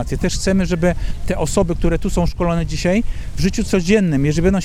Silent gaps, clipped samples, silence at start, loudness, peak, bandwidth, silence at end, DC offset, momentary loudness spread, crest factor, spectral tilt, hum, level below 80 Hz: none; under 0.1%; 0 s; -18 LUFS; -2 dBFS; 14.5 kHz; 0 s; under 0.1%; 6 LU; 16 dB; -6 dB/octave; none; -24 dBFS